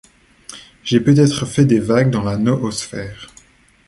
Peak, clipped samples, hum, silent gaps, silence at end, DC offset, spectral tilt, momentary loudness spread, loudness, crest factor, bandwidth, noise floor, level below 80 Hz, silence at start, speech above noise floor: -2 dBFS; under 0.1%; none; none; 0.6 s; under 0.1%; -6.5 dB/octave; 22 LU; -16 LUFS; 16 dB; 11.5 kHz; -49 dBFS; -46 dBFS; 0.5 s; 34 dB